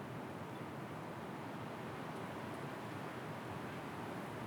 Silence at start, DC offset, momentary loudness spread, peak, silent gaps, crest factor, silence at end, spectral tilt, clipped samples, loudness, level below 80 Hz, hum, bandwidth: 0 s; under 0.1%; 1 LU; -34 dBFS; none; 12 dB; 0 s; -6 dB/octave; under 0.1%; -46 LUFS; -78 dBFS; none; over 20 kHz